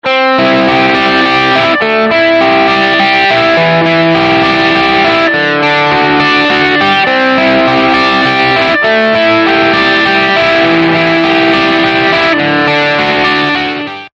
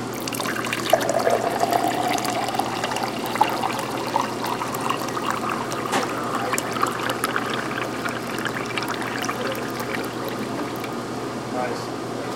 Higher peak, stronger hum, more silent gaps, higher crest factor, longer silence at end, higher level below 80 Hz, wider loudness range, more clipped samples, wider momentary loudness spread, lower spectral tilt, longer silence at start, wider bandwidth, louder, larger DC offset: about the same, 0 dBFS vs -2 dBFS; neither; neither; second, 8 dB vs 24 dB; about the same, 0.05 s vs 0 s; first, -42 dBFS vs -58 dBFS; second, 0 LU vs 4 LU; neither; second, 2 LU vs 7 LU; first, -5.5 dB/octave vs -3.5 dB/octave; about the same, 0.05 s vs 0 s; second, 8.2 kHz vs 17 kHz; first, -8 LUFS vs -25 LUFS; neither